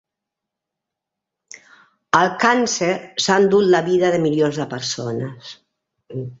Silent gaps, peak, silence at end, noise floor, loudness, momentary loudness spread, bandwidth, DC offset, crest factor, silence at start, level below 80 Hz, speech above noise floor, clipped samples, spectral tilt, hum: none; 0 dBFS; 0.05 s; -83 dBFS; -18 LUFS; 17 LU; 8 kHz; under 0.1%; 20 dB; 2.15 s; -62 dBFS; 65 dB; under 0.1%; -4.5 dB/octave; none